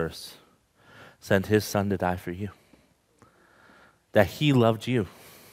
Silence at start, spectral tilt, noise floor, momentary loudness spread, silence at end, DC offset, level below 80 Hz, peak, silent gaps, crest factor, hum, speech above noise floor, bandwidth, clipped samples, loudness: 0 s; -6 dB/octave; -61 dBFS; 17 LU; 0.45 s; under 0.1%; -60 dBFS; -4 dBFS; none; 24 dB; none; 36 dB; 16 kHz; under 0.1%; -26 LUFS